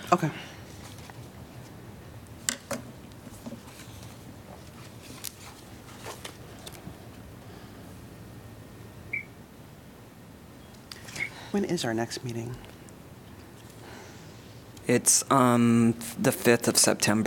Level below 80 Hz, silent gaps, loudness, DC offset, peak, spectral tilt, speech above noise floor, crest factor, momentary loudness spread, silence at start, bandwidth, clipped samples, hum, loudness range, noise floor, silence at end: -58 dBFS; none; -26 LUFS; under 0.1%; -4 dBFS; -3.5 dB/octave; 24 dB; 28 dB; 26 LU; 0 s; 18 kHz; under 0.1%; none; 18 LU; -49 dBFS; 0 s